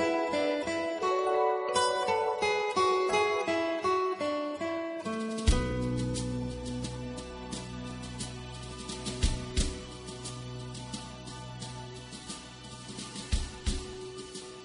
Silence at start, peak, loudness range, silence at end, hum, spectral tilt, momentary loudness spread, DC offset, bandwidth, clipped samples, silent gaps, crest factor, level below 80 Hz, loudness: 0 s; -12 dBFS; 11 LU; 0 s; none; -4.5 dB/octave; 14 LU; under 0.1%; 10.5 kHz; under 0.1%; none; 20 dB; -40 dBFS; -32 LUFS